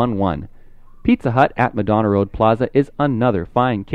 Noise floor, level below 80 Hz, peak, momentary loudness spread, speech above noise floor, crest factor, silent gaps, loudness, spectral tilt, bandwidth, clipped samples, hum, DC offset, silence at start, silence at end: -40 dBFS; -40 dBFS; 0 dBFS; 5 LU; 23 dB; 18 dB; none; -18 LUFS; -9 dB/octave; 6.4 kHz; under 0.1%; none; under 0.1%; 0 s; 0 s